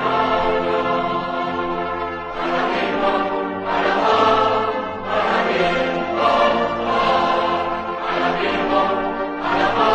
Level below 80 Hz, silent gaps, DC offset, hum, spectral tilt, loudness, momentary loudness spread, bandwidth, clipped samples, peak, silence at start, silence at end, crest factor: -44 dBFS; none; under 0.1%; none; -5.5 dB/octave; -19 LUFS; 7 LU; 8.8 kHz; under 0.1%; -4 dBFS; 0 s; 0 s; 16 dB